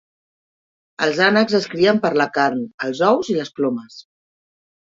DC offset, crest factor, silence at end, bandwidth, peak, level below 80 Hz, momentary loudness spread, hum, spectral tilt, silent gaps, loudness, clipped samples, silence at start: under 0.1%; 18 dB; 0.95 s; 7.8 kHz; -2 dBFS; -64 dBFS; 8 LU; none; -5 dB/octave; 2.74-2.78 s; -18 LUFS; under 0.1%; 1 s